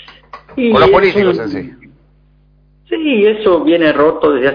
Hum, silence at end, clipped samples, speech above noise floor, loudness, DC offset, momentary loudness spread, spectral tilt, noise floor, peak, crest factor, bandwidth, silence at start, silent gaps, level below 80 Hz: 50 Hz at -45 dBFS; 0 s; under 0.1%; 38 dB; -11 LUFS; under 0.1%; 14 LU; -7.5 dB/octave; -49 dBFS; 0 dBFS; 12 dB; 5.4 kHz; 0.35 s; none; -42 dBFS